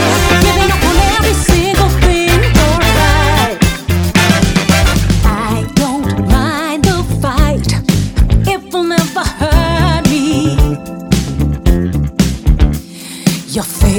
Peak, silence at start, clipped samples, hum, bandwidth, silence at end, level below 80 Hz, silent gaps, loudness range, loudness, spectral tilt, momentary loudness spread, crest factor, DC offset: 0 dBFS; 0 s; under 0.1%; none; over 20 kHz; 0 s; -16 dBFS; none; 3 LU; -12 LUFS; -5 dB/octave; 6 LU; 10 dB; under 0.1%